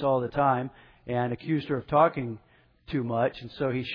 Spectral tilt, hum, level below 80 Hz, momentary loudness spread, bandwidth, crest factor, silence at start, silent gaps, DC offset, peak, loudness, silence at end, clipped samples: -9.5 dB/octave; none; -58 dBFS; 14 LU; 5.4 kHz; 20 dB; 0 s; none; under 0.1%; -8 dBFS; -28 LUFS; 0 s; under 0.1%